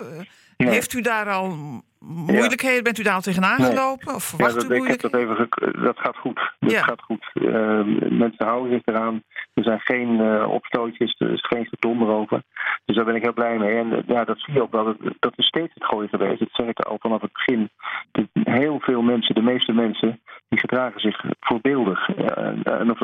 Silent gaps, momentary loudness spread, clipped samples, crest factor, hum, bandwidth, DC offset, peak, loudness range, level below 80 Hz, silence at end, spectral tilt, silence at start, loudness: none; 7 LU; under 0.1%; 18 dB; none; 16.5 kHz; under 0.1%; -4 dBFS; 2 LU; -62 dBFS; 0 s; -5 dB/octave; 0 s; -22 LUFS